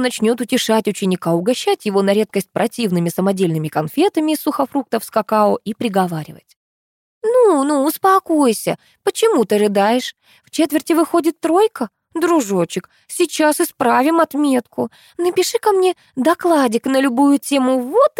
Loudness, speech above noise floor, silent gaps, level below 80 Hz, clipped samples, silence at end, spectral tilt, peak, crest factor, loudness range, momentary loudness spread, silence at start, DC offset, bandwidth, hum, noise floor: -17 LUFS; over 74 dB; 6.56-7.21 s; -68 dBFS; under 0.1%; 0.1 s; -5 dB/octave; -2 dBFS; 14 dB; 2 LU; 8 LU; 0 s; under 0.1%; 17 kHz; none; under -90 dBFS